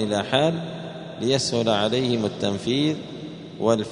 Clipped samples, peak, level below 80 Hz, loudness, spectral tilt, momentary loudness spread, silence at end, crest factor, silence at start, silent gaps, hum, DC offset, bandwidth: under 0.1%; -4 dBFS; -60 dBFS; -23 LUFS; -5 dB/octave; 14 LU; 0 s; 20 dB; 0 s; none; none; under 0.1%; 11 kHz